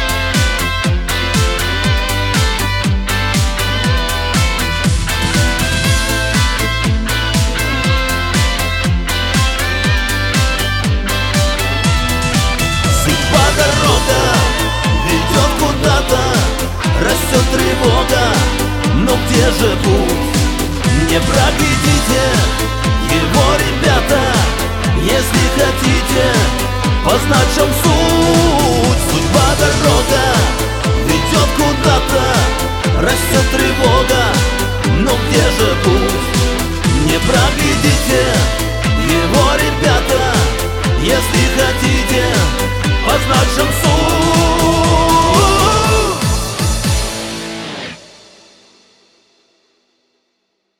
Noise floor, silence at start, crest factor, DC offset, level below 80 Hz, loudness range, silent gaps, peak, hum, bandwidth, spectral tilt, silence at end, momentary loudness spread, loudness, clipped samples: -67 dBFS; 0 s; 12 dB; under 0.1%; -20 dBFS; 3 LU; none; 0 dBFS; none; 19 kHz; -4 dB/octave; 2.75 s; 4 LU; -13 LUFS; under 0.1%